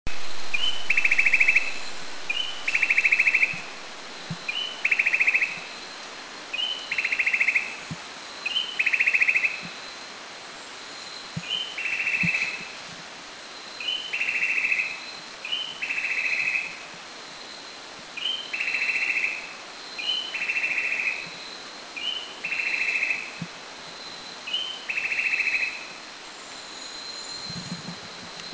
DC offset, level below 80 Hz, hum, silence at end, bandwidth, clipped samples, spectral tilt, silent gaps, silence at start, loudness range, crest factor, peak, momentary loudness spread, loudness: under 0.1%; -58 dBFS; none; 0 s; 8 kHz; under 0.1%; -1 dB/octave; none; 0.05 s; 6 LU; 20 dB; -6 dBFS; 18 LU; -24 LUFS